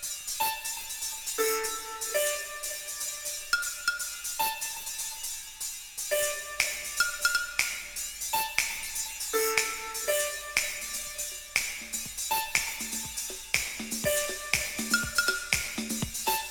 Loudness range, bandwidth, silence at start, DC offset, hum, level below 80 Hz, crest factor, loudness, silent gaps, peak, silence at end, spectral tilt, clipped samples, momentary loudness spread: 2 LU; over 20 kHz; 0 s; under 0.1%; none; -54 dBFS; 26 dB; -30 LUFS; none; -6 dBFS; 0 s; -0.5 dB/octave; under 0.1%; 7 LU